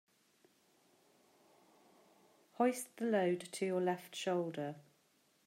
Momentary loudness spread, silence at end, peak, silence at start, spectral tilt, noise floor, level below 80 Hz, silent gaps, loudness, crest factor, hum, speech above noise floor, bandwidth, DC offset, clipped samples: 9 LU; 0.65 s; -22 dBFS; 2.6 s; -5 dB/octave; -74 dBFS; under -90 dBFS; none; -38 LUFS; 20 dB; none; 37 dB; 16 kHz; under 0.1%; under 0.1%